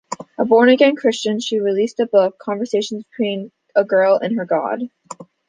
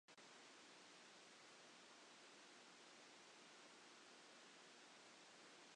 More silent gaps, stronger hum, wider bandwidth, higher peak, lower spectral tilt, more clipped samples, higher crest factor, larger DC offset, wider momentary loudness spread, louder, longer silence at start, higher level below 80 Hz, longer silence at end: neither; neither; about the same, 9.6 kHz vs 10 kHz; first, -2 dBFS vs -52 dBFS; first, -4.5 dB/octave vs -1 dB/octave; neither; about the same, 16 dB vs 12 dB; neither; first, 14 LU vs 0 LU; first, -17 LUFS vs -64 LUFS; about the same, 0.1 s vs 0.1 s; first, -68 dBFS vs under -90 dBFS; first, 0.25 s vs 0 s